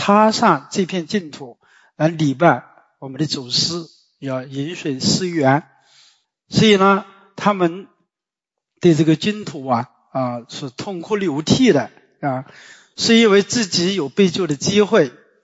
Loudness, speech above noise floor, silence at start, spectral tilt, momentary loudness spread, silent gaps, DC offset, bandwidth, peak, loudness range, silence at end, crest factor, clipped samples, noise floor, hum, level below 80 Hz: -18 LUFS; 71 dB; 0 s; -5 dB/octave; 15 LU; none; under 0.1%; 8 kHz; -2 dBFS; 4 LU; 0.35 s; 18 dB; under 0.1%; -88 dBFS; none; -56 dBFS